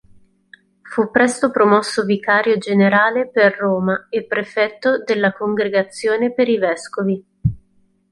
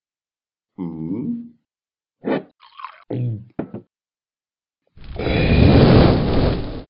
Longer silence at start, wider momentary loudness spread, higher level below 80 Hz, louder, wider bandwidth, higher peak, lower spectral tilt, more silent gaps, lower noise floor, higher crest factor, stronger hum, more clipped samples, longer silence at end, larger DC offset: about the same, 0.85 s vs 0.8 s; second, 8 LU vs 24 LU; second, -48 dBFS vs -30 dBFS; about the same, -17 LUFS vs -18 LUFS; first, 11.5 kHz vs 5.6 kHz; about the same, -2 dBFS vs 0 dBFS; about the same, -5.5 dB/octave vs -6.5 dB/octave; neither; second, -59 dBFS vs under -90 dBFS; about the same, 16 dB vs 20 dB; neither; neither; first, 0.55 s vs 0.05 s; neither